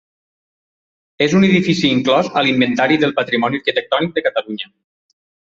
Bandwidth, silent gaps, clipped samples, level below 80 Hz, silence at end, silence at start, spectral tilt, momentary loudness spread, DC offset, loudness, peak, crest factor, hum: 7.6 kHz; none; under 0.1%; -56 dBFS; 0.95 s; 1.2 s; -5.5 dB/octave; 8 LU; under 0.1%; -15 LUFS; -2 dBFS; 16 dB; none